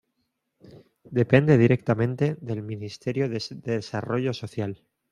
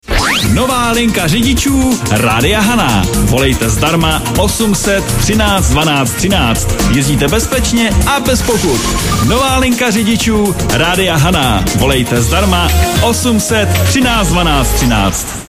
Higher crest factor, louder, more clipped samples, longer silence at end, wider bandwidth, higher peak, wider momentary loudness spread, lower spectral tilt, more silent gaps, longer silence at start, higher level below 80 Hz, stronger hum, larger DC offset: first, 22 dB vs 10 dB; second, -25 LUFS vs -11 LUFS; neither; first, 0.35 s vs 0.05 s; second, 10.5 kHz vs 16 kHz; second, -4 dBFS vs 0 dBFS; first, 14 LU vs 2 LU; first, -8 dB/octave vs -4 dB/octave; neither; first, 0.65 s vs 0.1 s; second, -60 dBFS vs -20 dBFS; neither; second, under 0.1% vs 0.6%